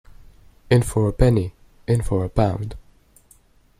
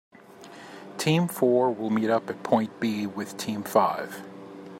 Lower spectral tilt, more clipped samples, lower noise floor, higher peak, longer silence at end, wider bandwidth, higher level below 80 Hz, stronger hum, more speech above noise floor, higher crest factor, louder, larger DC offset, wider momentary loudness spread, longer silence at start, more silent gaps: first, -7.5 dB/octave vs -5.5 dB/octave; neither; first, -55 dBFS vs -47 dBFS; about the same, -4 dBFS vs -6 dBFS; first, 1 s vs 0 s; second, 14.5 kHz vs 16 kHz; first, -34 dBFS vs -74 dBFS; neither; first, 36 dB vs 22 dB; about the same, 18 dB vs 22 dB; first, -21 LUFS vs -26 LUFS; neither; second, 14 LU vs 20 LU; second, 0.2 s vs 0.35 s; neither